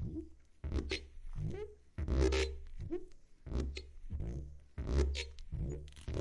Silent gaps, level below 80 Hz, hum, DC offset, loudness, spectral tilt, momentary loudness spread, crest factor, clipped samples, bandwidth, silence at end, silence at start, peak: none; -42 dBFS; none; under 0.1%; -41 LUFS; -6 dB/octave; 15 LU; 20 dB; under 0.1%; 11 kHz; 0 s; 0 s; -20 dBFS